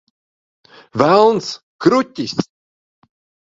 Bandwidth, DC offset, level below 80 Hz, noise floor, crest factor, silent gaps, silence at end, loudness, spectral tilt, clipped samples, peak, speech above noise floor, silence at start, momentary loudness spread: 7.8 kHz; under 0.1%; -58 dBFS; under -90 dBFS; 18 dB; 1.63-1.79 s; 1.05 s; -16 LUFS; -5.5 dB/octave; under 0.1%; 0 dBFS; over 76 dB; 0.95 s; 16 LU